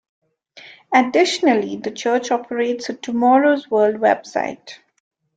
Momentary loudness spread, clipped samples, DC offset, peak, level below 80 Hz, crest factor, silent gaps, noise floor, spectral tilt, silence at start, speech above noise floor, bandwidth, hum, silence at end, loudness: 10 LU; under 0.1%; under 0.1%; -2 dBFS; -68 dBFS; 18 dB; none; -45 dBFS; -4 dB/octave; 0.55 s; 27 dB; 9.2 kHz; none; 0.6 s; -18 LUFS